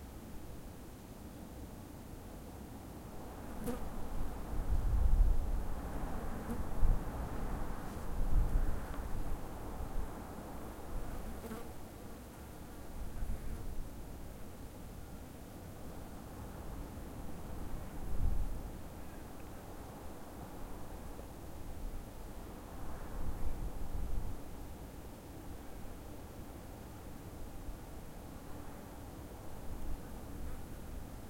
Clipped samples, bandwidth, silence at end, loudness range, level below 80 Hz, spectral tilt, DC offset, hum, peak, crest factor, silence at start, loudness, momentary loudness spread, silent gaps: under 0.1%; 16.5 kHz; 0 s; 10 LU; -40 dBFS; -6.5 dB/octave; under 0.1%; none; -16 dBFS; 22 dB; 0 s; -45 LUFS; 11 LU; none